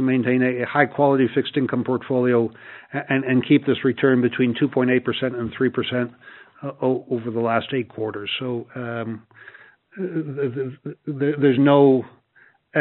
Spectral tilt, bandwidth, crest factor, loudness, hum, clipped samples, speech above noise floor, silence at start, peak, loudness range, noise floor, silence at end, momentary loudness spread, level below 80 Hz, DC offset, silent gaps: -5 dB/octave; 4.2 kHz; 20 dB; -21 LUFS; none; under 0.1%; 36 dB; 0 s; -2 dBFS; 7 LU; -57 dBFS; 0 s; 13 LU; -64 dBFS; under 0.1%; none